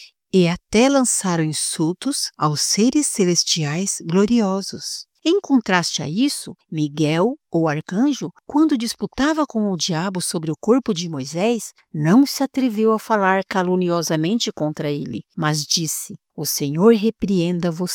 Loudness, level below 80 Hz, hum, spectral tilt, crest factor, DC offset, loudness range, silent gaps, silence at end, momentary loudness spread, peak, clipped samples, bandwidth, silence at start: -20 LUFS; -54 dBFS; none; -4.5 dB/octave; 18 dB; under 0.1%; 2 LU; none; 0 s; 9 LU; -2 dBFS; under 0.1%; 19 kHz; 0 s